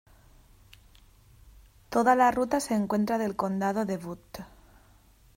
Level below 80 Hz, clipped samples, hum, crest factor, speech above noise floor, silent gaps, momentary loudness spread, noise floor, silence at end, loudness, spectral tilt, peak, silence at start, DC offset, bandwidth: -58 dBFS; under 0.1%; none; 20 dB; 32 dB; none; 21 LU; -59 dBFS; 0.9 s; -27 LUFS; -5.5 dB/octave; -10 dBFS; 1.9 s; under 0.1%; 16 kHz